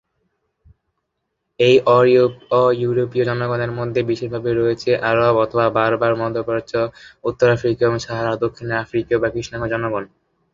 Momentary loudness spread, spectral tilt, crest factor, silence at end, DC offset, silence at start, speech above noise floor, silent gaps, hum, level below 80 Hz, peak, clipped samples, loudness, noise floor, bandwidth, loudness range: 9 LU; -6.5 dB/octave; 18 dB; 0.45 s; under 0.1%; 1.6 s; 57 dB; none; none; -50 dBFS; -2 dBFS; under 0.1%; -18 LUFS; -75 dBFS; 7.6 kHz; 3 LU